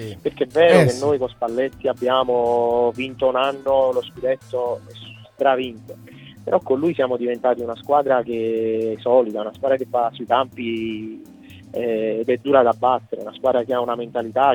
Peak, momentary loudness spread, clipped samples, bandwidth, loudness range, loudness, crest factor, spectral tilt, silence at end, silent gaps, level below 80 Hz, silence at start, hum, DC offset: -2 dBFS; 12 LU; under 0.1%; 17 kHz; 4 LU; -20 LUFS; 18 dB; -6 dB/octave; 0 s; none; -58 dBFS; 0 s; none; under 0.1%